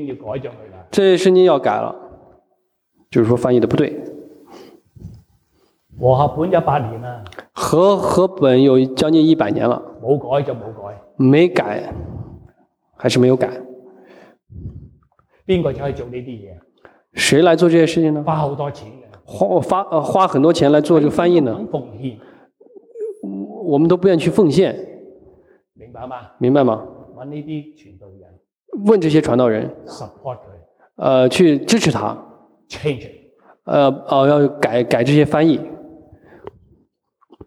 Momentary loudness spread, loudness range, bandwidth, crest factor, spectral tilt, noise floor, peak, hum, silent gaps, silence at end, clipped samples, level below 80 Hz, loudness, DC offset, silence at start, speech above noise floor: 21 LU; 6 LU; 13.5 kHz; 16 dB; -6.5 dB/octave; -67 dBFS; -2 dBFS; none; none; 1.6 s; under 0.1%; -50 dBFS; -16 LUFS; under 0.1%; 0 s; 51 dB